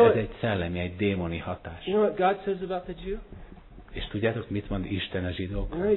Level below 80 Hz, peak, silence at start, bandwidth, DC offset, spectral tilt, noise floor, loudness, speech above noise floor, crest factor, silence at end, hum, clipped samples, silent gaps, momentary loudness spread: -44 dBFS; -8 dBFS; 0 s; 4.2 kHz; under 0.1%; -10.5 dB/octave; -47 dBFS; -29 LUFS; 19 dB; 20 dB; 0 s; none; under 0.1%; none; 12 LU